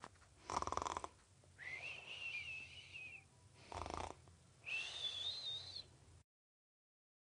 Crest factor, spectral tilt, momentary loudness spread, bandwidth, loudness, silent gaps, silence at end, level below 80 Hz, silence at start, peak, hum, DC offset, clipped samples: 28 dB; -2 dB/octave; 18 LU; 10.5 kHz; -47 LUFS; none; 1 s; -68 dBFS; 0 s; -24 dBFS; none; under 0.1%; under 0.1%